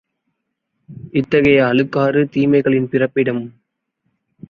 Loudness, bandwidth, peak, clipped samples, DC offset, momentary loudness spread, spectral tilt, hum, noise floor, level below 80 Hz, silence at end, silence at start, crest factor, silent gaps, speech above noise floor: -16 LUFS; 6.4 kHz; -2 dBFS; under 0.1%; under 0.1%; 9 LU; -8.5 dB/octave; none; -74 dBFS; -52 dBFS; 1 s; 0.9 s; 16 dB; none; 59 dB